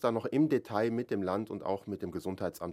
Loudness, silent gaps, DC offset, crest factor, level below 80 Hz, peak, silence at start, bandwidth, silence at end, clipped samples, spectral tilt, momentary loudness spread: -33 LUFS; none; under 0.1%; 18 dB; -68 dBFS; -14 dBFS; 0 s; 15.5 kHz; 0 s; under 0.1%; -7.5 dB/octave; 8 LU